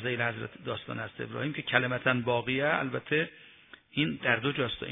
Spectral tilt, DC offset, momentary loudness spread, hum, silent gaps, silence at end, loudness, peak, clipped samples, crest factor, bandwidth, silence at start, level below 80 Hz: -9 dB/octave; under 0.1%; 10 LU; none; none; 0 s; -30 LUFS; -6 dBFS; under 0.1%; 24 dB; 3.9 kHz; 0 s; -64 dBFS